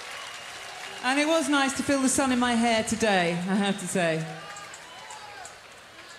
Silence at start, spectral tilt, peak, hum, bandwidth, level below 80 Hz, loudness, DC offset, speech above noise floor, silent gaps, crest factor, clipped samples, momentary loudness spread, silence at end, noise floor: 0 s; -3.5 dB/octave; -10 dBFS; none; 15 kHz; -60 dBFS; -25 LUFS; under 0.1%; 23 dB; none; 16 dB; under 0.1%; 18 LU; 0 s; -47 dBFS